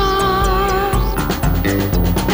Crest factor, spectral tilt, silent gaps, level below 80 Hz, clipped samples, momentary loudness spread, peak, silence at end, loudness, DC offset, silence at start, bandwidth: 10 dB; -5.5 dB/octave; none; -20 dBFS; under 0.1%; 3 LU; -6 dBFS; 0 s; -17 LUFS; under 0.1%; 0 s; 16 kHz